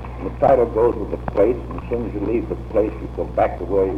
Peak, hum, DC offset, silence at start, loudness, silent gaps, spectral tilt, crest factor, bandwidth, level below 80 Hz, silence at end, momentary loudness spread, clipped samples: -4 dBFS; none; under 0.1%; 0 s; -21 LUFS; none; -9.5 dB/octave; 16 dB; 5.8 kHz; -32 dBFS; 0 s; 10 LU; under 0.1%